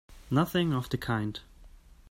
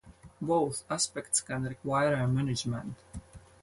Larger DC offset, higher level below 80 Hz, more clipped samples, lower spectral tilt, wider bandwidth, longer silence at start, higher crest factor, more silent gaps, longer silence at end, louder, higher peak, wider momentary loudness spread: neither; about the same, -52 dBFS vs -56 dBFS; neither; first, -6.5 dB/octave vs -4.5 dB/octave; first, 16 kHz vs 11.5 kHz; about the same, 0.1 s vs 0.05 s; about the same, 18 dB vs 18 dB; neither; first, 0.4 s vs 0.25 s; about the same, -30 LUFS vs -31 LUFS; about the same, -12 dBFS vs -14 dBFS; second, 9 LU vs 15 LU